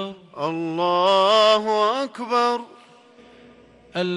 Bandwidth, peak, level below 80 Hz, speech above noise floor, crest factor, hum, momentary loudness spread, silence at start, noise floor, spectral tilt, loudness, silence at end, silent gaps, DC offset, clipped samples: 11.5 kHz; -6 dBFS; -70 dBFS; 30 dB; 16 dB; none; 14 LU; 0 s; -50 dBFS; -4.5 dB/octave; -20 LUFS; 0 s; none; under 0.1%; under 0.1%